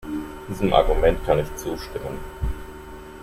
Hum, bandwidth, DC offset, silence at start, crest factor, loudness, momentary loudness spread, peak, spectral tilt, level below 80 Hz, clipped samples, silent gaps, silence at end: none; 16 kHz; under 0.1%; 0 s; 20 dB; -24 LUFS; 18 LU; -2 dBFS; -6 dB/octave; -30 dBFS; under 0.1%; none; 0 s